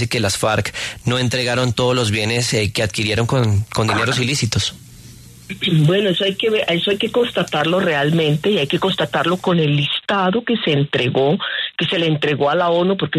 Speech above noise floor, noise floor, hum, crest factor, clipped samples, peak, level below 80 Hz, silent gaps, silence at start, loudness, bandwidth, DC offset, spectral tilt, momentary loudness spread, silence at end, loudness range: 23 dB; -40 dBFS; none; 14 dB; under 0.1%; -4 dBFS; -48 dBFS; none; 0 s; -17 LUFS; 13.5 kHz; under 0.1%; -5 dB/octave; 3 LU; 0 s; 1 LU